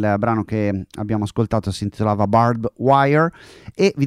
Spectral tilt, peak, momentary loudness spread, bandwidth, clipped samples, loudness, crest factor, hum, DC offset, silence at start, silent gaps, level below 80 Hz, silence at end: -7.5 dB/octave; -2 dBFS; 9 LU; 11.5 kHz; under 0.1%; -19 LUFS; 16 dB; none; under 0.1%; 0 s; none; -46 dBFS; 0 s